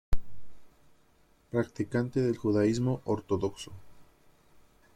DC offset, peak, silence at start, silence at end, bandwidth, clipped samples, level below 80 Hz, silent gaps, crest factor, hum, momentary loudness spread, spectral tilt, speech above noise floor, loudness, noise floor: under 0.1%; -12 dBFS; 0.1 s; 0.95 s; 13.5 kHz; under 0.1%; -44 dBFS; none; 18 dB; none; 15 LU; -7 dB/octave; 35 dB; -31 LUFS; -64 dBFS